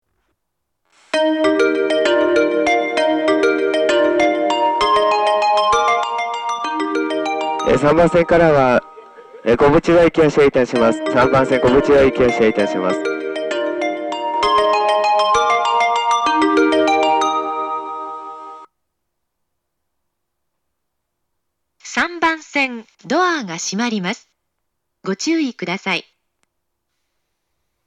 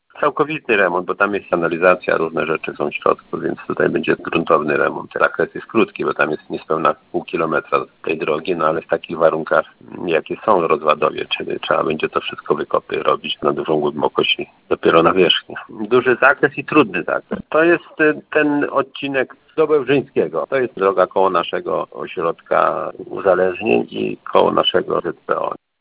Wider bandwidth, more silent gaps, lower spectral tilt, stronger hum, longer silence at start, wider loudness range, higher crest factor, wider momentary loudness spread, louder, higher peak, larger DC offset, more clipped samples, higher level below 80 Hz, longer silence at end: first, 10.5 kHz vs 4 kHz; neither; second, -4.5 dB/octave vs -9 dB/octave; neither; first, 1.15 s vs 0.15 s; first, 10 LU vs 4 LU; about the same, 16 dB vs 18 dB; about the same, 10 LU vs 8 LU; about the same, -16 LUFS vs -18 LUFS; about the same, 0 dBFS vs 0 dBFS; neither; neither; first, -44 dBFS vs -56 dBFS; first, 1.85 s vs 0.25 s